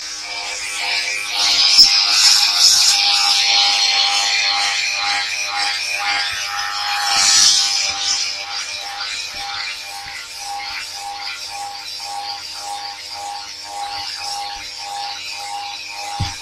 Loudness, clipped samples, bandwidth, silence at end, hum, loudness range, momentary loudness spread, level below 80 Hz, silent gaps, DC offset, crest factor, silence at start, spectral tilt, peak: -15 LUFS; under 0.1%; 16 kHz; 0 s; none; 15 LU; 17 LU; -52 dBFS; none; under 0.1%; 18 dB; 0 s; 2 dB/octave; 0 dBFS